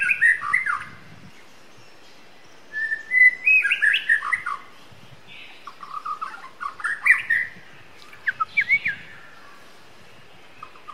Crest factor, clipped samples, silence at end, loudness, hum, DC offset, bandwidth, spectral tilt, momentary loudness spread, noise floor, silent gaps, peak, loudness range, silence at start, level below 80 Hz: 20 dB; under 0.1%; 0 s; -20 LUFS; none; 0.6%; 14.5 kHz; -1 dB/octave; 25 LU; -50 dBFS; none; -4 dBFS; 7 LU; 0 s; -68 dBFS